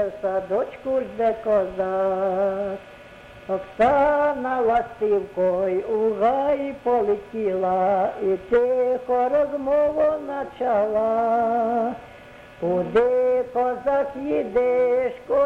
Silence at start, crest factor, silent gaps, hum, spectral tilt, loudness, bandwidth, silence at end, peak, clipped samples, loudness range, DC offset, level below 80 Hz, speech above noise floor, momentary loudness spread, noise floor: 0 s; 14 dB; none; none; -7.5 dB/octave; -22 LUFS; 7.8 kHz; 0 s; -8 dBFS; under 0.1%; 2 LU; under 0.1%; -52 dBFS; 22 dB; 6 LU; -44 dBFS